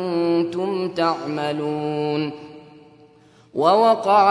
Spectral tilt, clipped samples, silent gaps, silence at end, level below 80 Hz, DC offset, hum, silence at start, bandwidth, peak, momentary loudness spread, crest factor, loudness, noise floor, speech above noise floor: -6.5 dB/octave; under 0.1%; none; 0 s; -68 dBFS; under 0.1%; none; 0 s; 11 kHz; -4 dBFS; 13 LU; 16 dB; -21 LUFS; -52 dBFS; 32 dB